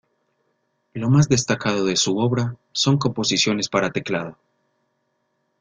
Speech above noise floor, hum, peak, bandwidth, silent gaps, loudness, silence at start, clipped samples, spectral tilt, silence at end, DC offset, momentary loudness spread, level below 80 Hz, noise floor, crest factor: 51 dB; none; -4 dBFS; 9.6 kHz; none; -20 LUFS; 0.95 s; under 0.1%; -4.5 dB/octave; 1.3 s; under 0.1%; 9 LU; -54 dBFS; -71 dBFS; 18 dB